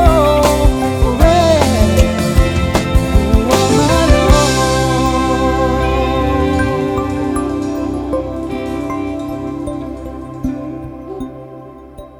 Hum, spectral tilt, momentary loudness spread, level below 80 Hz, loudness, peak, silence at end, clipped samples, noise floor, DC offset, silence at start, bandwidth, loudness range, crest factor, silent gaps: none; -5.5 dB/octave; 16 LU; -20 dBFS; -14 LUFS; 0 dBFS; 0 s; under 0.1%; -34 dBFS; under 0.1%; 0 s; 17.5 kHz; 11 LU; 14 dB; none